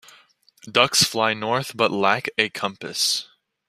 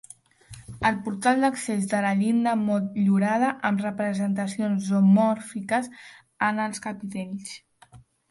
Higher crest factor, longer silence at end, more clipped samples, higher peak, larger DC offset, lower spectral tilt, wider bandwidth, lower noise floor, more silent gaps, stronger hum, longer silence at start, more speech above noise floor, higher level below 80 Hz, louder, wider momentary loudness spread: first, 22 dB vs 16 dB; about the same, 0.45 s vs 0.35 s; neither; first, -2 dBFS vs -8 dBFS; neither; second, -2 dB/octave vs -6 dB/octave; first, 15.5 kHz vs 11.5 kHz; about the same, -56 dBFS vs -53 dBFS; neither; neither; first, 0.65 s vs 0.5 s; first, 34 dB vs 29 dB; about the same, -64 dBFS vs -60 dBFS; first, -21 LUFS vs -24 LUFS; second, 8 LU vs 12 LU